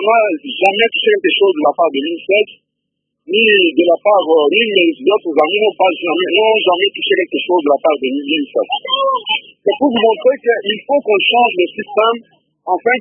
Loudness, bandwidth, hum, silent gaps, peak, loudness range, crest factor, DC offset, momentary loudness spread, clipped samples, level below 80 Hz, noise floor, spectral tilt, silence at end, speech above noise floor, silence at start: -13 LUFS; 6.2 kHz; none; none; 0 dBFS; 3 LU; 14 dB; under 0.1%; 6 LU; under 0.1%; -68 dBFS; -74 dBFS; -5.5 dB/octave; 0 s; 61 dB; 0 s